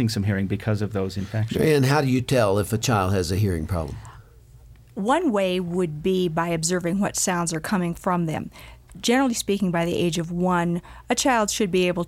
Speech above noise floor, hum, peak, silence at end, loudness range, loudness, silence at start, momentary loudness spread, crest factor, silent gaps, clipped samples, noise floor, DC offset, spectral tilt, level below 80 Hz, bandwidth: 26 dB; none; -8 dBFS; 0 s; 3 LU; -23 LUFS; 0 s; 7 LU; 16 dB; none; under 0.1%; -48 dBFS; under 0.1%; -5 dB/octave; -46 dBFS; 16.5 kHz